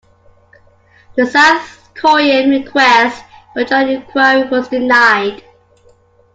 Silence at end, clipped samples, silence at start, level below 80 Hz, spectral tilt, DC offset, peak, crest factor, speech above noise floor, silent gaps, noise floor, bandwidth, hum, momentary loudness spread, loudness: 1 s; under 0.1%; 1.15 s; -54 dBFS; -3 dB/octave; under 0.1%; 0 dBFS; 14 dB; 37 dB; none; -49 dBFS; 9.2 kHz; none; 13 LU; -11 LUFS